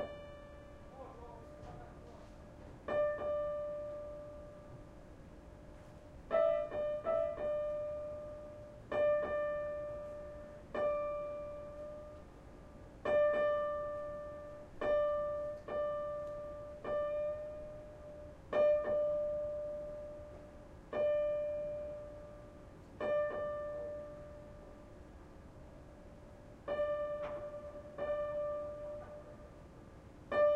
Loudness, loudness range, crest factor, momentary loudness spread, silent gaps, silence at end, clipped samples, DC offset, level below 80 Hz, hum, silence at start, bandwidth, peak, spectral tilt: -38 LUFS; 7 LU; 18 dB; 22 LU; none; 0 s; under 0.1%; under 0.1%; -60 dBFS; none; 0 s; 7.2 kHz; -22 dBFS; -6.5 dB/octave